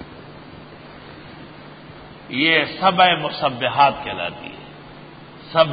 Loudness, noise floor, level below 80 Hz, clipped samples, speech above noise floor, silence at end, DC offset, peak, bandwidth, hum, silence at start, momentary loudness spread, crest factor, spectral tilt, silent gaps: -18 LUFS; -40 dBFS; -54 dBFS; under 0.1%; 22 dB; 0 s; under 0.1%; -2 dBFS; 5 kHz; none; 0 s; 24 LU; 20 dB; -9.5 dB/octave; none